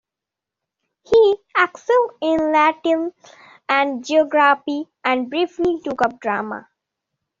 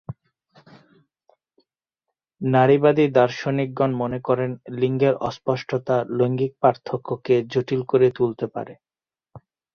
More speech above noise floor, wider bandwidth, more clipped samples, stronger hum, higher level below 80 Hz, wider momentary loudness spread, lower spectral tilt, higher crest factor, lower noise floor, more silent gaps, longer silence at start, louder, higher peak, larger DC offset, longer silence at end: first, 67 dB vs 63 dB; first, 7.6 kHz vs 6.8 kHz; neither; neither; about the same, -60 dBFS vs -62 dBFS; second, 9 LU vs 12 LU; second, -1.5 dB/octave vs -8 dB/octave; about the same, 18 dB vs 20 dB; about the same, -86 dBFS vs -84 dBFS; neither; first, 1.1 s vs 0.1 s; first, -18 LUFS vs -21 LUFS; about the same, -2 dBFS vs -2 dBFS; neither; first, 0.8 s vs 0.35 s